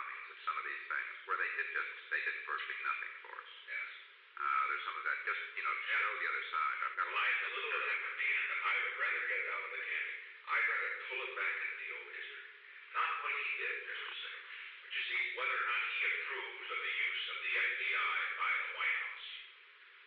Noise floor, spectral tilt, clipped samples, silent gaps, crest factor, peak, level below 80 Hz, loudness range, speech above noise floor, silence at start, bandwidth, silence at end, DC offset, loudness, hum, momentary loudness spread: -59 dBFS; 7 dB/octave; under 0.1%; none; 14 dB; -24 dBFS; under -90 dBFS; 4 LU; 21 dB; 0 s; 6.4 kHz; 0 s; under 0.1%; -36 LUFS; none; 12 LU